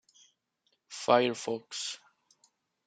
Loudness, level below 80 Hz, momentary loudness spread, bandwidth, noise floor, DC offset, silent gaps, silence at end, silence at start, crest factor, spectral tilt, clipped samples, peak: -30 LUFS; -82 dBFS; 18 LU; 9.4 kHz; -77 dBFS; under 0.1%; none; 0.9 s; 0.9 s; 26 dB; -3 dB/octave; under 0.1%; -8 dBFS